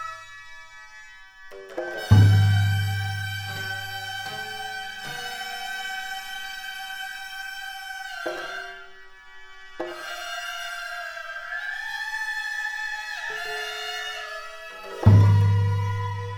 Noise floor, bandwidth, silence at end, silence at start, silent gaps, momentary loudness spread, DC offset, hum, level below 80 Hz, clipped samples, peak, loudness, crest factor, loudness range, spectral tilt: -46 dBFS; 15.5 kHz; 0 s; 0 s; none; 24 LU; under 0.1%; none; -50 dBFS; under 0.1%; -2 dBFS; -26 LUFS; 24 dB; 11 LU; -5.5 dB/octave